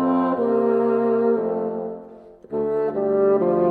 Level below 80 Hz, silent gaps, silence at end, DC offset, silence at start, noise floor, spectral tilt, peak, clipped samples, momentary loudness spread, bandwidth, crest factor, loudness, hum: -60 dBFS; none; 0 s; under 0.1%; 0 s; -43 dBFS; -10.5 dB/octave; -8 dBFS; under 0.1%; 11 LU; 4.5 kHz; 12 dB; -21 LUFS; none